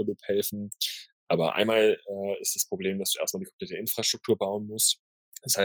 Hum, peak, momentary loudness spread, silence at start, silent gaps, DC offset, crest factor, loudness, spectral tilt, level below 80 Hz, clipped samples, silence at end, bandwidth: none; -8 dBFS; 9 LU; 0 s; 1.13-1.27 s, 3.53-3.59 s, 4.99-5.32 s; under 0.1%; 20 dB; -27 LUFS; -2.5 dB/octave; -76 dBFS; under 0.1%; 0 s; over 20 kHz